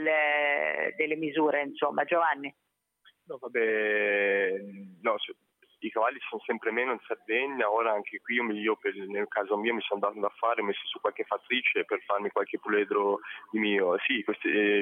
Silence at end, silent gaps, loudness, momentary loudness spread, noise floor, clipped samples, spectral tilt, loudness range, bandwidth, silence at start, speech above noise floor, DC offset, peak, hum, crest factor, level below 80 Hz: 0 s; none; -29 LUFS; 9 LU; -65 dBFS; under 0.1%; -6.5 dB/octave; 2 LU; 3.8 kHz; 0 s; 36 dB; under 0.1%; -12 dBFS; none; 16 dB; -90 dBFS